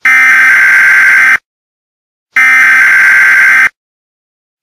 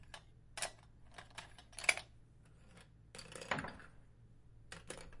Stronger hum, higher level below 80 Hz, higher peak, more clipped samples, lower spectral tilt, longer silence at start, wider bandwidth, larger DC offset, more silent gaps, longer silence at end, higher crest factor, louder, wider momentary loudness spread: neither; first, -54 dBFS vs -64 dBFS; first, 0 dBFS vs -12 dBFS; first, 0.8% vs under 0.1%; second, 0.5 dB/octave vs -1.5 dB/octave; about the same, 0.05 s vs 0 s; first, 16 kHz vs 11.5 kHz; neither; first, 1.45-2.26 s vs none; first, 0.95 s vs 0 s; second, 6 dB vs 36 dB; first, -3 LUFS vs -42 LUFS; second, 5 LU vs 27 LU